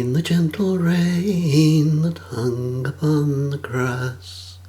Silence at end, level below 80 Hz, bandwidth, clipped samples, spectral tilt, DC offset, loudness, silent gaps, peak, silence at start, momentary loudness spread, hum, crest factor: 0 s; -56 dBFS; 15 kHz; under 0.1%; -7 dB/octave; under 0.1%; -20 LUFS; none; -4 dBFS; 0 s; 9 LU; none; 16 dB